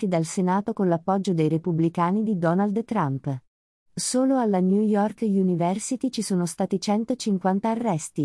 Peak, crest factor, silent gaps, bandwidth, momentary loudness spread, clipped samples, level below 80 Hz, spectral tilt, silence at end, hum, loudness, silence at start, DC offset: -8 dBFS; 14 dB; 3.47-3.86 s; 12 kHz; 5 LU; under 0.1%; -66 dBFS; -6 dB/octave; 0 s; none; -24 LUFS; 0 s; under 0.1%